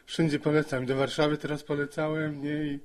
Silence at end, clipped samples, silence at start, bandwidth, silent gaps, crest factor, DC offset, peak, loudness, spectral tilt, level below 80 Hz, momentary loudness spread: 0 s; under 0.1%; 0.1 s; 13 kHz; none; 16 dB; under 0.1%; -12 dBFS; -29 LUFS; -6 dB/octave; -58 dBFS; 6 LU